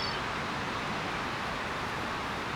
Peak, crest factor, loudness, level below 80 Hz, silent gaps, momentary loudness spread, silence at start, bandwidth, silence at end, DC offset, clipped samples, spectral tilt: -22 dBFS; 12 dB; -33 LUFS; -52 dBFS; none; 1 LU; 0 s; over 20 kHz; 0 s; under 0.1%; under 0.1%; -4 dB/octave